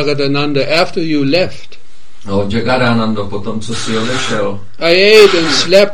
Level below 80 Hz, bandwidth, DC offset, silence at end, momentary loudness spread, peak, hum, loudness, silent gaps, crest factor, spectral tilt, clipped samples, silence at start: -46 dBFS; 15.5 kHz; 10%; 0 s; 14 LU; 0 dBFS; none; -12 LUFS; none; 14 dB; -4.5 dB/octave; 1%; 0 s